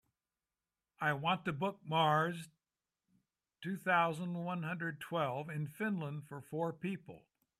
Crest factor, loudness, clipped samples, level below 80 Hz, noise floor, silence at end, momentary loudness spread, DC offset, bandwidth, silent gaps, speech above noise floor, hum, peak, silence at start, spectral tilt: 20 dB; -37 LUFS; under 0.1%; -78 dBFS; under -90 dBFS; 0.4 s; 14 LU; under 0.1%; 15 kHz; none; over 53 dB; none; -18 dBFS; 1 s; -6 dB/octave